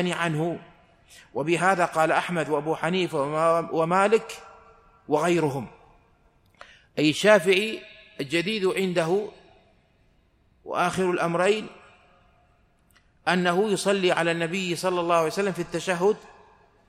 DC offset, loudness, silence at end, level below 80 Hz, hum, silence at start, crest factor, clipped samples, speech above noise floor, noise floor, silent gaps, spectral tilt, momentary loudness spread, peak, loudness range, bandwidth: under 0.1%; -24 LUFS; 0.7 s; -64 dBFS; none; 0 s; 20 dB; under 0.1%; 39 dB; -63 dBFS; none; -5 dB/octave; 12 LU; -4 dBFS; 5 LU; 15.5 kHz